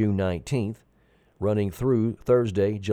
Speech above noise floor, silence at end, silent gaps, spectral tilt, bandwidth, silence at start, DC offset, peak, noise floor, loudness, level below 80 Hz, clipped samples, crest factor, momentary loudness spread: 38 dB; 0 s; none; -8 dB/octave; 14 kHz; 0 s; under 0.1%; -10 dBFS; -62 dBFS; -25 LUFS; -50 dBFS; under 0.1%; 16 dB; 8 LU